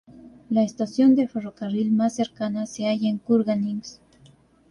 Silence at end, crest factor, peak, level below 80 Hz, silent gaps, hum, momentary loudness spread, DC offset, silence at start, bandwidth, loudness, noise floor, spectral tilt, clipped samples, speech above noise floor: 0.75 s; 16 dB; -8 dBFS; -64 dBFS; none; none; 11 LU; under 0.1%; 0.15 s; 10.5 kHz; -23 LUFS; -55 dBFS; -6.5 dB/octave; under 0.1%; 32 dB